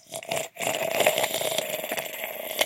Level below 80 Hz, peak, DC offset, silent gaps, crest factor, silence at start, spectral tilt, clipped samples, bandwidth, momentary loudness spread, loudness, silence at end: -74 dBFS; -4 dBFS; under 0.1%; none; 24 dB; 0.1 s; -1 dB/octave; under 0.1%; 17 kHz; 9 LU; -27 LUFS; 0 s